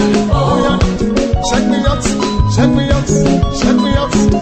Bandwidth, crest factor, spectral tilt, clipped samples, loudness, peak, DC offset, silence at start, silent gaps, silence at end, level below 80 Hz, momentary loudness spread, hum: 8.8 kHz; 12 dB; -6 dB/octave; under 0.1%; -13 LUFS; 0 dBFS; under 0.1%; 0 s; none; 0 s; -22 dBFS; 3 LU; none